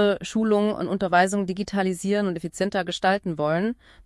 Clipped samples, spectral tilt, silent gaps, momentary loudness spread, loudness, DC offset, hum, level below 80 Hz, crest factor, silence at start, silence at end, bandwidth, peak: under 0.1%; -5.5 dB/octave; none; 6 LU; -24 LUFS; under 0.1%; none; -56 dBFS; 18 dB; 0 s; 0.35 s; 12 kHz; -4 dBFS